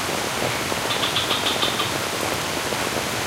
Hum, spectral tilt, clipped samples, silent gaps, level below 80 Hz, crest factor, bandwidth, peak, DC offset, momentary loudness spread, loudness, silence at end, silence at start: none; -2 dB/octave; under 0.1%; none; -50 dBFS; 18 dB; 16.5 kHz; -6 dBFS; under 0.1%; 3 LU; -22 LUFS; 0 s; 0 s